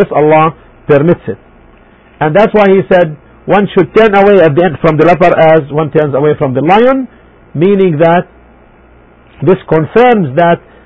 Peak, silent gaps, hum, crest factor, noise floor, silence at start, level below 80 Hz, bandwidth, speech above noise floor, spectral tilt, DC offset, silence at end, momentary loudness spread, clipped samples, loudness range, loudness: 0 dBFS; none; none; 8 dB; -40 dBFS; 0 s; -40 dBFS; 8 kHz; 33 dB; -9 dB/octave; under 0.1%; 0.3 s; 9 LU; 0.7%; 4 LU; -8 LUFS